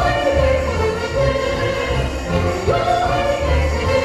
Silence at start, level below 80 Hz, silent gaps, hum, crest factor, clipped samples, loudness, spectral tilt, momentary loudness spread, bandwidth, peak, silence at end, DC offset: 0 s; -26 dBFS; none; none; 14 dB; under 0.1%; -18 LUFS; -5.5 dB/octave; 3 LU; 13.5 kHz; -4 dBFS; 0 s; 0.1%